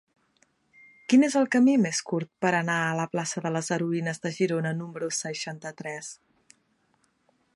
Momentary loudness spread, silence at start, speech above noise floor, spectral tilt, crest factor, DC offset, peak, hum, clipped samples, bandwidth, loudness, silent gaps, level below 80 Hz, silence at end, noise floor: 15 LU; 1.1 s; 44 dB; -5 dB/octave; 18 dB; under 0.1%; -10 dBFS; none; under 0.1%; 11.5 kHz; -26 LUFS; none; -76 dBFS; 1.4 s; -69 dBFS